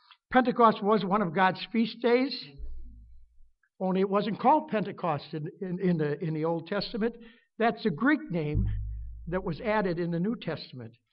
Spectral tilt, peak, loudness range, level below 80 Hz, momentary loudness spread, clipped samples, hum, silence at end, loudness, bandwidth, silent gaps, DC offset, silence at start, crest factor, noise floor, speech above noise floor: -5 dB/octave; -8 dBFS; 3 LU; -44 dBFS; 13 LU; under 0.1%; none; 0.2 s; -28 LUFS; 5.6 kHz; none; under 0.1%; 0.3 s; 20 dB; -57 dBFS; 29 dB